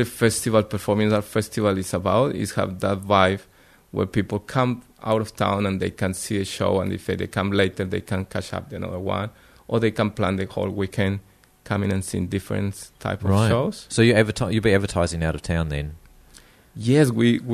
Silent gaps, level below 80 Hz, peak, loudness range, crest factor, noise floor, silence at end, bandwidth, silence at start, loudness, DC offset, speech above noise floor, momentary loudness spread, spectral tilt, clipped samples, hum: none; -44 dBFS; -2 dBFS; 4 LU; 20 dB; -51 dBFS; 0 s; 13.5 kHz; 0 s; -23 LUFS; under 0.1%; 29 dB; 10 LU; -6 dB/octave; under 0.1%; none